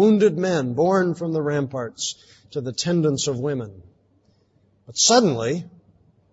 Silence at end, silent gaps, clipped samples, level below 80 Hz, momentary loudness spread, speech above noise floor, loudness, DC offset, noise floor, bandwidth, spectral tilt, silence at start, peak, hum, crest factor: 0.7 s; none; under 0.1%; -62 dBFS; 15 LU; 41 dB; -21 LUFS; under 0.1%; -61 dBFS; 8 kHz; -4.5 dB/octave; 0 s; -4 dBFS; none; 18 dB